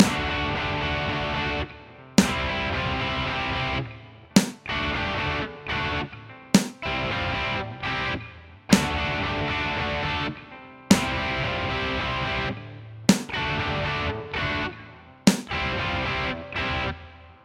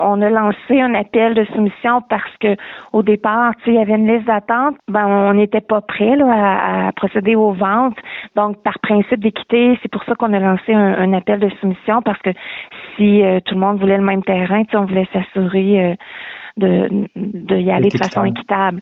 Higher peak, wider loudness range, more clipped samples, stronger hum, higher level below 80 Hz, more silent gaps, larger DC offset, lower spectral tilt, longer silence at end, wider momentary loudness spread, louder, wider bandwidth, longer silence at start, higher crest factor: about the same, -2 dBFS vs -2 dBFS; about the same, 2 LU vs 2 LU; neither; neither; first, -40 dBFS vs -54 dBFS; neither; neither; second, -4.5 dB/octave vs -8.5 dB/octave; about the same, 0.1 s vs 0 s; first, 11 LU vs 7 LU; second, -25 LUFS vs -15 LUFS; first, 16 kHz vs 6.4 kHz; about the same, 0 s vs 0 s; first, 24 dB vs 12 dB